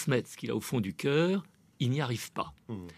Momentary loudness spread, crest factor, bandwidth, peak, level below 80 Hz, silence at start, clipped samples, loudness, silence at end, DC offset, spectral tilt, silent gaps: 10 LU; 20 dB; 14.5 kHz; -12 dBFS; -66 dBFS; 0 s; under 0.1%; -32 LUFS; 0.05 s; under 0.1%; -6 dB/octave; none